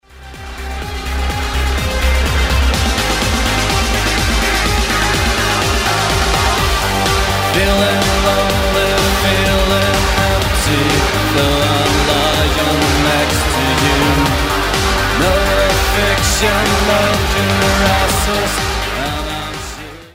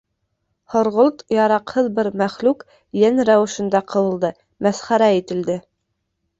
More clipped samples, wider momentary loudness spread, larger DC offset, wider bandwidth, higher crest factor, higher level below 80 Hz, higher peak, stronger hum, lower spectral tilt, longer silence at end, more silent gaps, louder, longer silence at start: neither; about the same, 6 LU vs 8 LU; neither; first, 16.5 kHz vs 8 kHz; about the same, 14 dB vs 16 dB; first, -20 dBFS vs -60 dBFS; about the same, 0 dBFS vs -2 dBFS; neither; second, -4 dB/octave vs -5.5 dB/octave; second, 0.05 s vs 0.8 s; neither; first, -14 LUFS vs -19 LUFS; second, 0.15 s vs 0.7 s